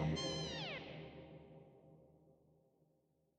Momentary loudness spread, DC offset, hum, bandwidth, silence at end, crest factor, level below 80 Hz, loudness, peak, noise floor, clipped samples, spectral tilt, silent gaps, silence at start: 24 LU; under 0.1%; none; 9 kHz; 1.05 s; 20 dB; -64 dBFS; -44 LUFS; -28 dBFS; -79 dBFS; under 0.1%; -4.5 dB/octave; none; 0 s